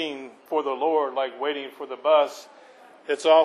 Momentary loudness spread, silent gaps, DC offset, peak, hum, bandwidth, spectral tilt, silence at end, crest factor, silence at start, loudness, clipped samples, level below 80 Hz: 16 LU; none; under 0.1%; -6 dBFS; none; 13 kHz; -2.5 dB/octave; 0 s; 18 dB; 0 s; -25 LUFS; under 0.1%; -90 dBFS